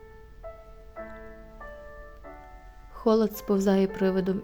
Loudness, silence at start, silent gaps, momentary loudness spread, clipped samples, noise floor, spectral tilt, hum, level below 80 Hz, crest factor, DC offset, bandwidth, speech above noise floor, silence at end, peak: -25 LUFS; 0.05 s; none; 23 LU; under 0.1%; -47 dBFS; -7 dB/octave; none; -50 dBFS; 18 dB; under 0.1%; over 20 kHz; 23 dB; 0 s; -10 dBFS